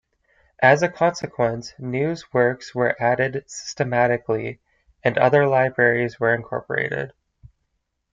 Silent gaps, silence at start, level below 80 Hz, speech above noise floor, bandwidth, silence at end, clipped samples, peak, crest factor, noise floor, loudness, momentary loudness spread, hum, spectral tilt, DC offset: none; 0.6 s; -58 dBFS; 54 dB; 7.8 kHz; 1.05 s; under 0.1%; -2 dBFS; 20 dB; -74 dBFS; -21 LUFS; 11 LU; none; -6 dB/octave; under 0.1%